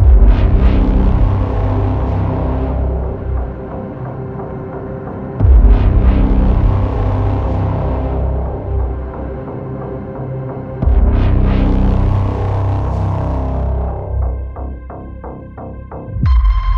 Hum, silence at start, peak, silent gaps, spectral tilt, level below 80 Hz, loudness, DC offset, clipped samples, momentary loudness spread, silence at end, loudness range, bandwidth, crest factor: none; 0 s; 0 dBFS; none; -10.5 dB/octave; -16 dBFS; -16 LUFS; under 0.1%; under 0.1%; 13 LU; 0 s; 6 LU; 4.5 kHz; 14 dB